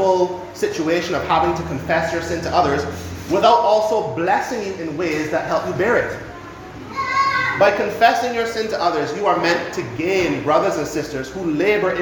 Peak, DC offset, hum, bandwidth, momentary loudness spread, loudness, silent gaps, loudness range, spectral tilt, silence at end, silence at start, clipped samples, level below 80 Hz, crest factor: 0 dBFS; under 0.1%; none; 19 kHz; 10 LU; -19 LUFS; none; 2 LU; -5 dB/octave; 0 s; 0 s; under 0.1%; -46 dBFS; 18 dB